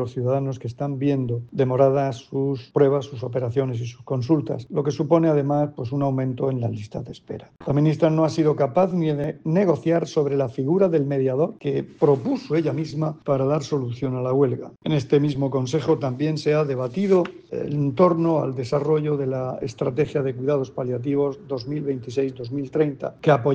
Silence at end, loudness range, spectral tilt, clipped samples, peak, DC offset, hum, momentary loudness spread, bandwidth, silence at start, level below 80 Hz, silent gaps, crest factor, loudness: 0 s; 3 LU; -8 dB/octave; under 0.1%; -4 dBFS; under 0.1%; none; 8 LU; 8.2 kHz; 0 s; -60 dBFS; none; 18 dB; -23 LUFS